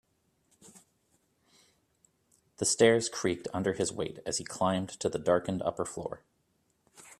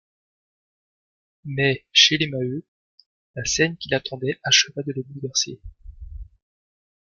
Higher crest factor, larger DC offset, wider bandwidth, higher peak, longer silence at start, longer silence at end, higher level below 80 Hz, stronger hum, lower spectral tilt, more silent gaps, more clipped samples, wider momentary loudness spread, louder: about the same, 24 dB vs 24 dB; neither; first, 13.5 kHz vs 11 kHz; second, -10 dBFS vs 0 dBFS; second, 0.75 s vs 1.45 s; second, 0.1 s vs 0.8 s; second, -66 dBFS vs -48 dBFS; neither; first, -4 dB/octave vs -2.5 dB/octave; second, none vs 2.68-2.98 s, 3.06-3.34 s; neither; second, 12 LU vs 25 LU; second, -30 LUFS vs -21 LUFS